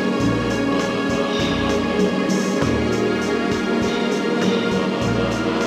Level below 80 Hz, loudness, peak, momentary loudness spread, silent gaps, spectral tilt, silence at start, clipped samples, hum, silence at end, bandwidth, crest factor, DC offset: -40 dBFS; -20 LUFS; -8 dBFS; 1 LU; none; -5.5 dB/octave; 0 s; under 0.1%; none; 0 s; 14.5 kHz; 12 dB; under 0.1%